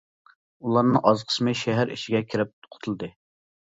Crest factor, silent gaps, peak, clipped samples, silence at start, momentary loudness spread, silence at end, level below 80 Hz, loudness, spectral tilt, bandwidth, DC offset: 24 dB; 2.53-2.62 s; -2 dBFS; under 0.1%; 0.65 s; 14 LU; 0.7 s; -64 dBFS; -24 LUFS; -6 dB/octave; 8 kHz; under 0.1%